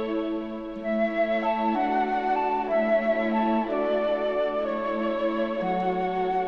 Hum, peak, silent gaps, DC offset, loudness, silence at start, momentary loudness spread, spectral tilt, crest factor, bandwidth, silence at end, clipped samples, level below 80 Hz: none; -14 dBFS; none; 0.2%; -26 LUFS; 0 s; 5 LU; -7.5 dB/octave; 12 dB; 6.6 kHz; 0 s; under 0.1%; -54 dBFS